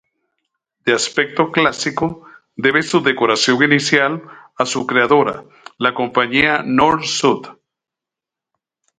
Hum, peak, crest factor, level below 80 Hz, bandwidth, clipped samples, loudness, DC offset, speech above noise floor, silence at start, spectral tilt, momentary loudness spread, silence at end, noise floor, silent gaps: none; 0 dBFS; 18 dB; -56 dBFS; 9.6 kHz; under 0.1%; -16 LUFS; under 0.1%; 70 dB; 0.85 s; -3.5 dB/octave; 9 LU; 1.5 s; -86 dBFS; none